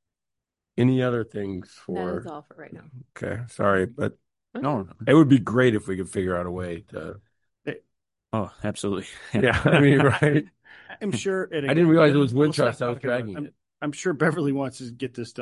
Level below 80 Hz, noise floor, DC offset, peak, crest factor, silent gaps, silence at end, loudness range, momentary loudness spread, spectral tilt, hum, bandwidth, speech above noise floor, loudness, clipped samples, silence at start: -50 dBFS; -86 dBFS; under 0.1%; -4 dBFS; 20 dB; none; 0 s; 8 LU; 19 LU; -7 dB/octave; none; 11.5 kHz; 62 dB; -23 LUFS; under 0.1%; 0.75 s